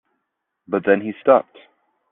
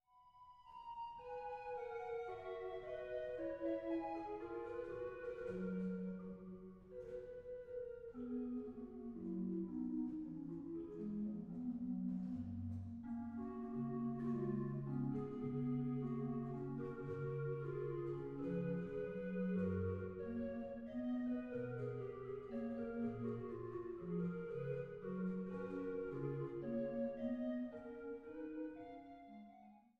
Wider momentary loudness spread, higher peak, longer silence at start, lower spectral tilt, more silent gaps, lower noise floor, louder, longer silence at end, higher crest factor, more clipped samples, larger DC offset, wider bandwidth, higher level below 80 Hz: about the same, 7 LU vs 9 LU; first, -2 dBFS vs -30 dBFS; first, 0.7 s vs 0.15 s; second, -5 dB/octave vs -10.5 dB/octave; neither; first, -77 dBFS vs -65 dBFS; first, -19 LUFS vs -45 LUFS; first, 0.7 s vs 0.2 s; about the same, 20 dB vs 16 dB; neither; neither; second, 3.8 kHz vs 5.2 kHz; about the same, -70 dBFS vs -70 dBFS